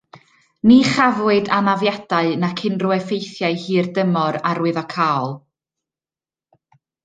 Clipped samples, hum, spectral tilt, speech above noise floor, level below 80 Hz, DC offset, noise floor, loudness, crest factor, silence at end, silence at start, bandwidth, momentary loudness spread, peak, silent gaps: under 0.1%; none; -6 dB/octave; over 73 dB; -58 dBFS; under 0.1%; under -90 dBFS; -18 LUFS; 18 dB; 1.65 s; 0.15 s; 9.2 kHz; 9 LU; -2 dBFS; none